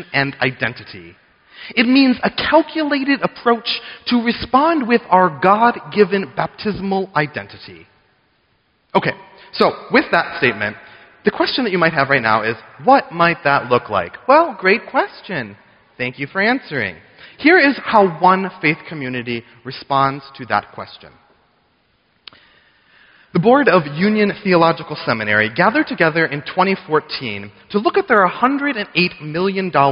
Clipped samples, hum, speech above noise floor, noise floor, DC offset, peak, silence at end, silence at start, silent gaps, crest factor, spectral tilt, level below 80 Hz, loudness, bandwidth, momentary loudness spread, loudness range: under 0.1%; none; 45 dB; -61 dBFS; under 0.1%; 0 dBFS; 0 s; 0 s; none; 18 dB; -3 dB/octave; -54 dBFS; -16 LUFS; 5.6 kHz; 12 LU; 6 LU